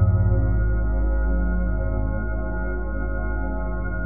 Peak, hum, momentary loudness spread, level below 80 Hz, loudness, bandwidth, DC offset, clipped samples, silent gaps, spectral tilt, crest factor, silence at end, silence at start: -8 dBFS; none; 7 LU; -24 dBFS; -25 LUFS; 2.3 kHz; 3%; under 0.1%; none; -12.5 dB/octave; 14 dB; 0 s; 0 s